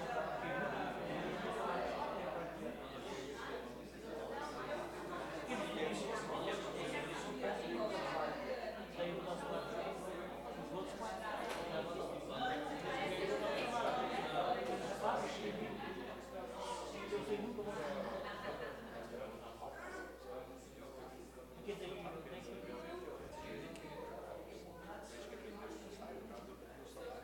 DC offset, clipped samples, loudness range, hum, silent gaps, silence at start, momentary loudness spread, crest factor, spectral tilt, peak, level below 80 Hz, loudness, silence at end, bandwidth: under 0.1%; under 0.1%; 10 LU; none; none; 0 s; 11 LU; 18 dB; -4.5 dB/octave; -26 dBFS; -64 dBFS; -44 LUFS; 0 s; 17 kHz